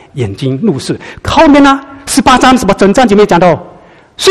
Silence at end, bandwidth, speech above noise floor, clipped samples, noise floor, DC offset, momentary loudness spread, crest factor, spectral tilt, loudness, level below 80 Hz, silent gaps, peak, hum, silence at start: 0 s; 13.5 kHz; 23 dB; 2%; -30 dBFS; 1%; 11 LU; 8 dB; -5 dB/octave; -8 LUFS; -32 dBFS; none; 0 dBFS; none; 0.15 s